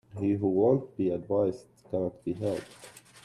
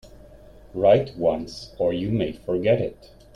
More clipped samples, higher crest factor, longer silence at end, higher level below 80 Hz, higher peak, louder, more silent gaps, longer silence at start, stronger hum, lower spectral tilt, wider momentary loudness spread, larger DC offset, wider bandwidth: neither; about the same, 18 dB vs 18 dB; second, 0.05 s vs 0.4 s; second, -66 dBFS vs -48 dBFS; second, -12 dBFS vs -6 dBFS; second, -29 LUFS vs -23 LUFS; neither; about the same, 0.15 s vs 0.05 s; neither; about the same, -8.5 dB/octave vs -7.5 dB/octave; first, 21 LU vs 13 LU; neither; first, 12.5 kHz vs 11 kHz